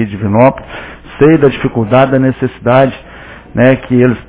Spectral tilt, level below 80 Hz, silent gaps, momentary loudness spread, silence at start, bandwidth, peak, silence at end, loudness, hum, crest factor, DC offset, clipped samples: -11.5 dB/octave; -36 dBFS; none; 17 LU; 0 s; 4 kHz; 0 dBFS; 0.05 s; -10 LUFS; none; 10 dB; under 0.1%; 0.5%